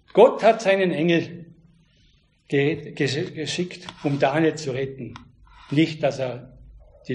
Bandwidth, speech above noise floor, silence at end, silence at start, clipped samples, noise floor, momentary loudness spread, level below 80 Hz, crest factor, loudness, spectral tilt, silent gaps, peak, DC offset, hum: 10.5 kHz; 38 dB; 0 s; 0.15 s; under 0.1%; -60 dBFS; 14 LU; -56 dBFS; 20 dB; -22 LUFS; -6 dB/octave; none; -2 dBFS; under 0.1%; none